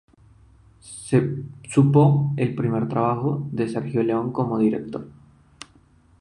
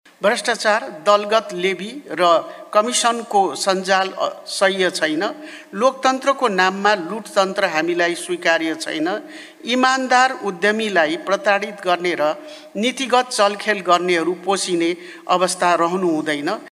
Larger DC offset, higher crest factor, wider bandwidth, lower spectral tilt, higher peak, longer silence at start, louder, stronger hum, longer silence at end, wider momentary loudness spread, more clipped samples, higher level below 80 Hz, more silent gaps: neither; about the same, 18 dB vs 18 dB; second, 11 kHz vs 15 kHz; first, -8 dB/octave vs -3 dB/octave; about the same, -4 dBFS vs -2 dBFS; first, 0.85 s vs 0.2 s; second, -22 LUFS vs -18 LUFS; neither; first, 1.1 s vs 0.05 s; first, 15 LU vs 7 LU; neither; first, -56 dBFS vs -74 dBFS; neither